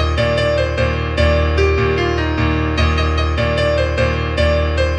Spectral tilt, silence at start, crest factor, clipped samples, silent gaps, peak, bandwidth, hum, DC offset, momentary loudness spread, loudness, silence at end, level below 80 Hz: -6.5 dB/octave; 0 s; 14 dB; under 0.1%; none; -2 dBFS; 8.8 kHz; none; under 0.1%; 2 LU; -16 LUFS; 0 s; -22 dBFS